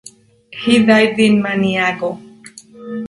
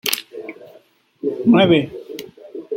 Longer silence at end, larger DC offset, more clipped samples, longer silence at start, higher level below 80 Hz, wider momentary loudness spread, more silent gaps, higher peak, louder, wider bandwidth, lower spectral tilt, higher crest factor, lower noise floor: about the same, 0 s vs 0 s; neither; neither; first, 0.5 s vs 0.05 s; about the same, -54 dBFS vs -58 dBFS; about the same, 21 LU vs 22 LU; neither; about the same, 0 dBFS vs 0 dBFS; first, -14 LUFS vs -17 LUFS; second, 11.5 kHz vs 16.5 kHz; about the same, -5.5 dB/octave vs -5 dB/octave; about the same, 16 dB vs 20 dB; second, -42 dBFS vs -51 dBFS